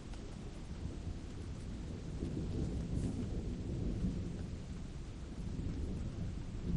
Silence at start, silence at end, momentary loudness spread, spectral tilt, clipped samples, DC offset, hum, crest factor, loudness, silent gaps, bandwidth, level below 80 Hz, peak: 0 s; 0 s; 8 LU; -7.5 dB/octave; under 0.1%; under 0.1%; none; 16 dB; -43 LUFS; none; 11 kHz; -44 dBFS; -24 dBFS